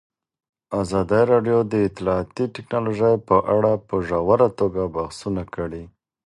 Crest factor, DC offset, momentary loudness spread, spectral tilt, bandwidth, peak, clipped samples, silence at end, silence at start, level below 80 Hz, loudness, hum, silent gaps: 18 dB; under 0.1%; 11 LU; -7.5 dB/octave; 11.5 kHz; -4 dBFS; under 0.1%; 0.4 s; 0.7 s; -46 dBFS; -21 LUFS; none; none